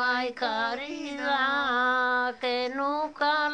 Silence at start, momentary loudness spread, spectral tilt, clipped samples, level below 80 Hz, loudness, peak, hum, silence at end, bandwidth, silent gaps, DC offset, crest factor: 0 s; 6 LU; -2.5 dB/octave; under 0.1%; -68 dBFS; -27 LUFS; -14 dBFS; none; 0 s; 9.8 kHz; none; under 0.1%; 14 dB